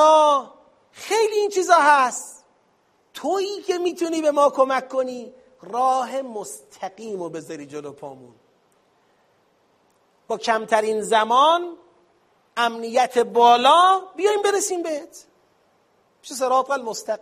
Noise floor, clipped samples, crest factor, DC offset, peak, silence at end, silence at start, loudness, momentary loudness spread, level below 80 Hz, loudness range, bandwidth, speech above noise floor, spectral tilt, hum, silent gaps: -63 dBFS; under 0.1%; 20 dB; under 0.1%; -2 dBFS; 0.05 s; 0 s; -20 LUFS; 20 LU; -76 dBFS; 15 LU; 15.5 kHz; 42 dB; -2 dB/octave; none; none